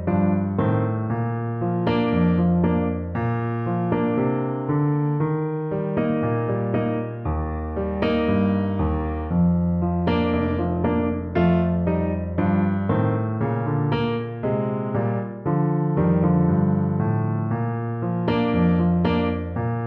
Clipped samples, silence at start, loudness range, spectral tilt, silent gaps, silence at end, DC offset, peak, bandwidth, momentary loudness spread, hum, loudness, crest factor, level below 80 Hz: under 0.1%; 0 s; 2 LU; -11 dB/octave; none; 0 s; under 0.1%; -8 dBFS; 4.4 kHz; 6 LU; none; -23 LUFS; 14 dB; -38 dBFS